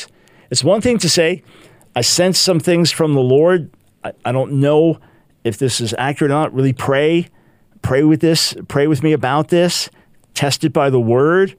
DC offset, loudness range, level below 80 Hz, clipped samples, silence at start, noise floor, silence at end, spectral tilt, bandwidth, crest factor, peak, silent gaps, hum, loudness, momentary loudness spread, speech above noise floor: under 0.1%; 3 LU; -52 dBFS; under 0.1%; 0 s; -41 dBFS; 0.1 s; -4.5 dB/octave; 16 kHz; 14 dB; 0 dBFS; none; none; -15 LUFS; 13 LU; 26 dB